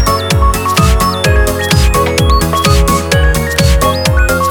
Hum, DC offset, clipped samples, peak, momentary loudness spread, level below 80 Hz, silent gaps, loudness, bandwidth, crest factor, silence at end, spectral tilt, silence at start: none; under 0.1%; under 0.1%; 0 dBFS; 2 LU; -14 dBFS; none; -10 LUFS; 19.5 kHz; 10 dB; 0 s; -4.5 dB/octave; 0 s